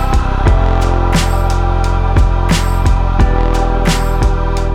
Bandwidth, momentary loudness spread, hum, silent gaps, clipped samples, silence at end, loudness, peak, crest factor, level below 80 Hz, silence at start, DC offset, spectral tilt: 13.5 kHz; 2 LU; none; none; under 0.1%; 0 s; -14 LUFS; 0 dBFS; 10 dB; -12 dBFS; 0 s; under 0.1%; -6 dB/octave